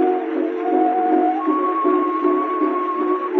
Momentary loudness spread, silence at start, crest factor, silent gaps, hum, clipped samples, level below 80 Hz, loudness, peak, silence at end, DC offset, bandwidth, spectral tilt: 4 LU; 0 s; 12 dB; none; none; under 0.1%; -86 dBFS; -19 LUFS; -6 dBFS; 0 s; under 0.1%; 4.2 kHz; -2.5 dB/octave